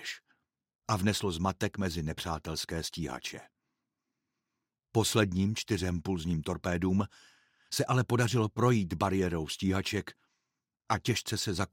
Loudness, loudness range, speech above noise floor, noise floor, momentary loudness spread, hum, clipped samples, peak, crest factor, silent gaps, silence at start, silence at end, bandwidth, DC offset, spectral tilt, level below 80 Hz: -32 LUFS; 6 LU; 57 dB; -88 dBFS; 9 LU; none; under 0.1%; -12 dBFS; 22 dB; 0.75-0.79 s; 0 s; 0.05 s; 16.5 kHz; under 0.1%; -5 dB/octave; -54 dBFS